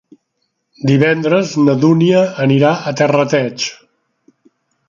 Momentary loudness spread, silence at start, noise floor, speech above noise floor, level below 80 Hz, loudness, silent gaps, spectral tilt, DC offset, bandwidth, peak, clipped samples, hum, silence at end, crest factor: 8 LU; 0.85 s; -69 dBFS; 57 dB; -60 dBFS; -13 LUFS; none; -6.5 dB/octave; under 0.1%; 7.4 kHz; 0 dBFS; under 0.1%; none; 1.15 s; 14 dB